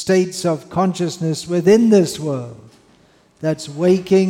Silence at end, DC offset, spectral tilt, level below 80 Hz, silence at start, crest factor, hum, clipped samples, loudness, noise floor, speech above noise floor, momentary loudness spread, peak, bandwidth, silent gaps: 0 s; under 0.1%; -6 dB/octave; -58 dBFS; 0 s; 14 dB; none; under 0.1%; -17 LUFS; -53 dBFS; 37 dB; 12 LU; -2 dBFS; 16 kHz; none